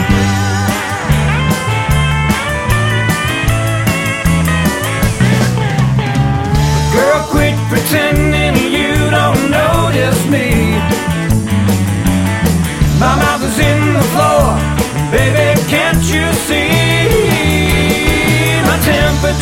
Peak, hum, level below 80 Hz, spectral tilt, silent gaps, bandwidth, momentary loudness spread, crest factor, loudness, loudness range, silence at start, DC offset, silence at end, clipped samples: 0 dBFS; none; -22 dBFS; -5 dB/octave; none; 17 kHz; 3 LU; 12 dB; -12 LUFS; 2 LU; 0 s; under 0.1%; 0 s; under 0.1%